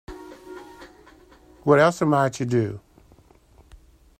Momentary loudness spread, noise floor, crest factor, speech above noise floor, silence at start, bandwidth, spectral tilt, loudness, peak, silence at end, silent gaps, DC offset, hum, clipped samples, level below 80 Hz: 24 LU; -54 dBFS; 20 dB; 34 dB; 0.1 s; 16 kHz; -6.5 dB/octave; -21 LUFS; -6 dBFS; 1.4 s; none; under 0.1%; none; under 0.1%; -54 dBFS